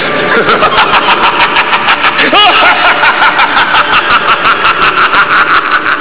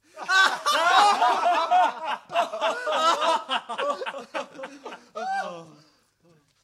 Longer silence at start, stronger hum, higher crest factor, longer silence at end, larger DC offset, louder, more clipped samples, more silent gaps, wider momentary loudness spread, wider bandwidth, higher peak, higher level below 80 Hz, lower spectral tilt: second, 0 s vs 0.15 s; neither; second, 8 dB vs 18 dB; second, 0 s vs 1 s; first, 5% vs under 0.1%; first, -6 LUFS vs -23 LUFS; first, 3% vs under 0.1%; neither; second, 3 LU vs 19 LU; second, 4 kHz vs 15 kHz; first, 0 dBFS vs -6 dBFS; first, -40 dBFS vs -82 dBFS; first, -6 dB/octave vs -0.5 dB/octave